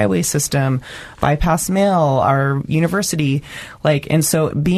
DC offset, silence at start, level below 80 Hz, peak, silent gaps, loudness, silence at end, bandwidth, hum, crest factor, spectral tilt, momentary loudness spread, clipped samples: under 0.1%; 0 s; -36 dBFS; -2 dBFS; none; -17 LUFS; 0 s; 13.5 kHz; none; 16 dB; -5.5 dB/octave; 6 LU; under 0.1%